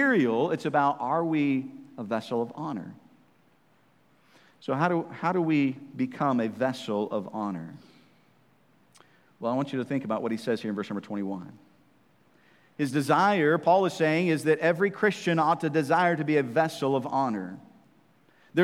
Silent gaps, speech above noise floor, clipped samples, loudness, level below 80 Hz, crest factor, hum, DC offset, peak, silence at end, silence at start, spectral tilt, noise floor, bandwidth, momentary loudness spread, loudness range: none; 38 dB; under 0.1%; -27 LUFS; -80 dBFS; 20 dB; none; under 0.1%; -8 dBFS; 0 s; 0 s; -6.5 dB/octave; -64 dBFS; 15 kHz; 12 LU; 10 LU